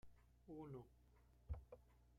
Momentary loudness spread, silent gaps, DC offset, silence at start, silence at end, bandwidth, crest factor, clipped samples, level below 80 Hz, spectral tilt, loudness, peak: 11 LU; none; under 0.1%; 0.05 s; 0 s; 13 kHz; 20 dB; under 0.1%; -64 dBFS; -9 dB/octave; -58 LUFS; -38 dBFS